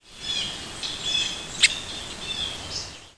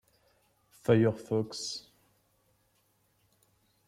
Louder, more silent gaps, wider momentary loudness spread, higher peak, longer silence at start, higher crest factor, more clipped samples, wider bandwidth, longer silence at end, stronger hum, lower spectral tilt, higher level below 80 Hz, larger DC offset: first, -25 LUFS vs -30 LUFS; neither; about the same, 12 LU vs 12 LU; first, -2 dBFS vs -14 dBFS; second, 0.05 s vs 0.9 s; about the same, 26 dB vs 22 dB; neither; second, 11 kHz vs 15 kHz; second, 0.05 s vs 2.1 s; neither; second, 0 dB/octave vs -6 dB/octave; first, -50 dBFS vs -70 dBFS; first, 0.1% vs under 0.1%